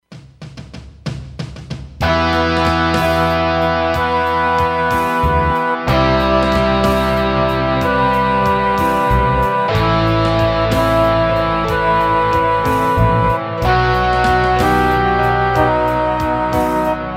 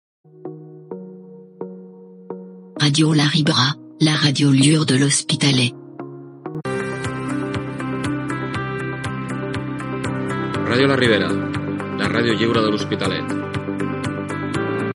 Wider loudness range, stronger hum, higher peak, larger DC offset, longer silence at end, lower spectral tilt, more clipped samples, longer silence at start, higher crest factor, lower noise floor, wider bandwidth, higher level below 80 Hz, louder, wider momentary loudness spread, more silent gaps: second, 2 LU vs 8 LU; neither; about the same, 0 dBFS vs 0 dBFS; neither; about the same, 0 s vs 0 s; first, -6.5 dB/octave vs -4.5 dB/octave; neither; second, 0.1 s vs 0.35 s; second, 14 dB vs 20 dB; second, -35 dBFS vs -41 dBFS; first, 16.5 kHz vs 11.5 kHz; first, -28 dBFS vs -52 dBFS; first, -15 LUFS vs -19 LUFS; second, 4 LU vs 20 LU; neither